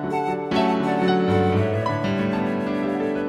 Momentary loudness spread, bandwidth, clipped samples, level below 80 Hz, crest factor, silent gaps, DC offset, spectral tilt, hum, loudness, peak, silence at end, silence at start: 5 LU; 11 kHz; under 0.1%; -54 dBFS; 14 dB; none; under 0.1%; -7.5 dB/octave; none; -22 LUFS; -8 dBFS; 0 s; 0 s